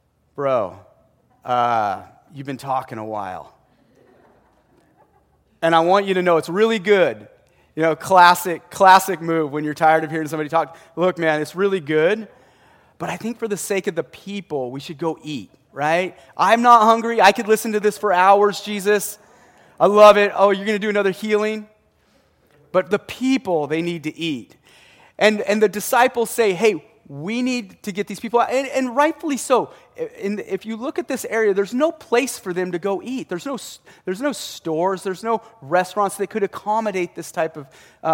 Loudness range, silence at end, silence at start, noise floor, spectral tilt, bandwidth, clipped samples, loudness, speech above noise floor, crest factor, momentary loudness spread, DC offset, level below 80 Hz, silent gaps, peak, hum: 9 LU; 0 s; 0.35 s; -59 dBFS; -4.5 dB/octave; 17 kHz; under 0.1%; -19 LUFS; 40 dB; 20 dB; 16 LU; under 0.1%; -64 dBFS; none; 0 dBFS; none